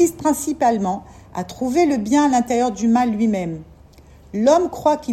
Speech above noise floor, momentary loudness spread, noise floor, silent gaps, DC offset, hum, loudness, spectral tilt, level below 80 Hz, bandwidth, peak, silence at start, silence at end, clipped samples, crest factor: 28 dB; 14 LU; -46 dBFS; none; under 0.1%; none; -18 LUFS; -5.5 dB/octave; -48 dBFS; 15.5 kHz; -4 dBFS; 0 s; 0 s; under 0.1%; 16 dB